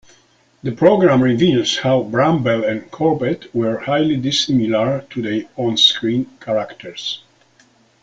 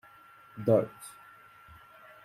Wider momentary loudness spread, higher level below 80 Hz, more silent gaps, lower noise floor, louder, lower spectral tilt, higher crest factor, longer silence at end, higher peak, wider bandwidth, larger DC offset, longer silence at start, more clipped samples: second, 13 LU vs 26 LU; first, -54 dBFS vs -70 dBFS; neither; about the same, -55 dBFS vs -56 dBFS; first, -17 LUFS vs -29 LUFS; second, -5 dB/octave vs -7.5 dB/octave; second, 16 dB vs 22 dB; second, 0.85 s vs 1.15 s; first, 0 dBFS vs -12 dBFS; second, 9 kHz vs 15.5 kHz; neither; about the same, 0.65 s vs 0.55 s; neither